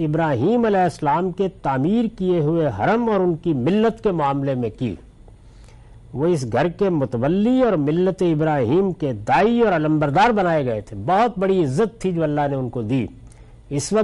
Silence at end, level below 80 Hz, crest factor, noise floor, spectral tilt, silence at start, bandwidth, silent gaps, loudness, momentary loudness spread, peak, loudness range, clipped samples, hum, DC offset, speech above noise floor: 0 s; -46 dBFS; 12 dB; -45 dBFS; -7 dB/octave; 0 s; 11.5 kHz; none; -20 LUFS; 7 LU; -8 dBFS; 4 LU; under 0.1%; none; under 0.1%; 26 dB